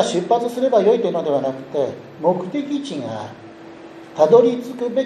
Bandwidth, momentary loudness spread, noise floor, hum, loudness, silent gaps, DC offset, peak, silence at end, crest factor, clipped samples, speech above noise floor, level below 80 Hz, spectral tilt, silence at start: 12.5 kHz; 23 LU; -39 dBFS; none; -19 LUFS; none; under 0.1%; -2 dBFS; 0 s; 18 dB; under 0.1%; 20 dB; -68 dBFS; -6 dB/octave; 0 s